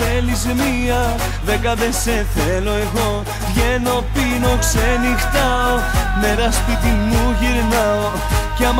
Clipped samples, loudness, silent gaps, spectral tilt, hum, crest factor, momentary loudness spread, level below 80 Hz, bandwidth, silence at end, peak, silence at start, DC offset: under 0.1%; -17 LUFS; none; -4.5 dB/octave; none; 12 dB; 3 LU; -22 dBFS; 16.5 kHz; 0 s; -4 dBFS; 0 s; under 0.1%